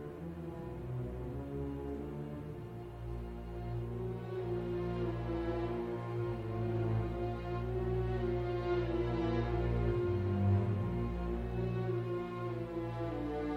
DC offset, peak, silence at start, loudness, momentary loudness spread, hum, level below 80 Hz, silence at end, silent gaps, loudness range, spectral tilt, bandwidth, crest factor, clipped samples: under 0.1%; -20 dBFS; 0 s; -38 LUFS; 10 LU; none; -46 dBFS; 0 s; none; 8 LU; -9.5 dB/octave; 6.2 kHz; 16 dB; under 0.1%